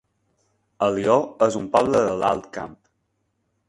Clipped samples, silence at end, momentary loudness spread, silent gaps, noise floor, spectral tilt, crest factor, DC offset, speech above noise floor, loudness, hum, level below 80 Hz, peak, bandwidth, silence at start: under 0.1%; 0.95 s; 15 LU; none; -72 dBFS; -5.5 dB/octave; 20 dB; under 0.1%; 52 dB; -21 LUFS; none; -56 dBFS; -4 dBFS; 11.5 kHz; 0.8 s